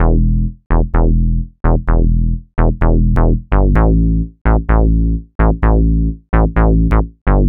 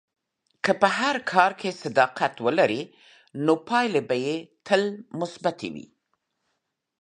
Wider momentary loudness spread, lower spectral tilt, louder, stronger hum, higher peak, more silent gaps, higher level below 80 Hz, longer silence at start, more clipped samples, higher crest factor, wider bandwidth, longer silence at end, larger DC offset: second, 5 LU vs 12 LU; first, -11.5 dB/octave vs -5 dB/octave; first, -15 LUFS vs -24 LUFS; neither; about the same, 0 dBFS vs -2 dBFS; first, 0.66-0.70 s, 4.41-4.45 s, 5.35-5.39 s, 7.21-7.26 s vs none; first, -14 dBFS vs -74 dBFS; second, 0 s vs 0.65 s; neither; second, 12 dB vs 24 dB; second, 3 kHz vs 10.5 kHz; second, 0 s vs 1.2 s; neither